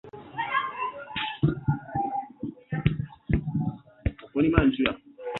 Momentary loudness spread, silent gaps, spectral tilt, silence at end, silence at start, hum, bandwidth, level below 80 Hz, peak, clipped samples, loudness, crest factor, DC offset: 11 LU; none; -9 dB/octave; 0 s; 0.05 s; none; 4.2 kHz; -40 dBFS; -2 dBFS; under 0.1%; -28 LUFS; 26 dB; under 0.1%